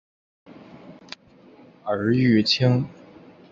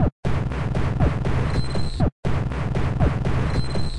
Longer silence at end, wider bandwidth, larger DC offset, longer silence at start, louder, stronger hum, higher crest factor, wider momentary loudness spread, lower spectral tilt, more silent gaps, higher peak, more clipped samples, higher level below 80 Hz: first, 0.6 s vs 0 s; second, 7.6 kHz vs 11 kHz; second, under 0.1% vs 3%; first, 0.85 s vs 0 s; first, -21 LUFS vs -24 LUFS; neither; about the same, 18 dB vs 14 dB; first, 23 LU vs 3 LU; about the same, -6.5 dB/octave vs -7.5 dB/octave; second, none vs 0.12-0.23 s, 2.12-2.23 s; about the same, -6 dBFS vs -8 dBFS; neither; second, -58 dBFS vs -28 dBFS